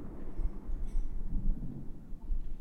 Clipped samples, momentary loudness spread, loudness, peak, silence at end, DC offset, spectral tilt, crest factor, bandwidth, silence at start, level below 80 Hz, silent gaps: under 0.1%; 8 LU; -43 LUFS; -20 dBFS; 0 s; under 0.1%; -9 dB/octave; 12 dB; 1.9 kHz; 0 s; -34 dBFS; none